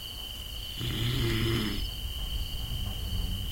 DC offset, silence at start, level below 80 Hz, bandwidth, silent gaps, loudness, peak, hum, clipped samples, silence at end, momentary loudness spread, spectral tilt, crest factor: under 0.1%; 0 s; -36 dBFS; 16.5 kHz; none; -33 LUFS; -16 dBFS; none; under 0.1%; 0 s; 9 LU; -4.5 dB/octave; 16 dB